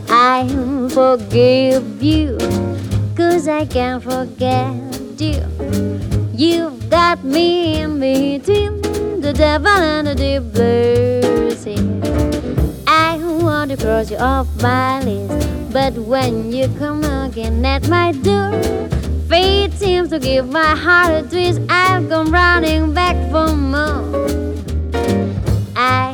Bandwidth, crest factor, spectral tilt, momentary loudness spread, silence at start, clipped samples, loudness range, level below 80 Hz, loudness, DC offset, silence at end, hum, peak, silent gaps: 19.5 kHz; 14 dB; -6 dB/octave; 8 LU; 0 s; under 0.1%; 4 LU; -26 dBFS; -16 LUFS; under 0.1%; 0 s; none; 0 dBFS; none